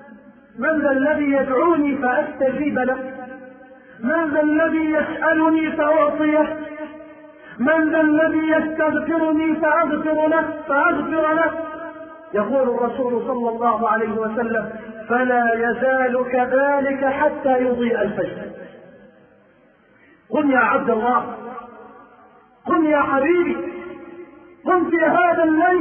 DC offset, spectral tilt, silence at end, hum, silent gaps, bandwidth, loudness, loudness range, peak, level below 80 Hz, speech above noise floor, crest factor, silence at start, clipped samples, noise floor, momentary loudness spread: under 0.1%; -10.5 dB/octave; 0 s; none; none; 3.4 kHz; -19 LUFS; 4 LU; -4 dBFS; -56 dBFS; 36 dB; 16 dB; 0 s; under 0.1%; -54 dBFS; 16 LU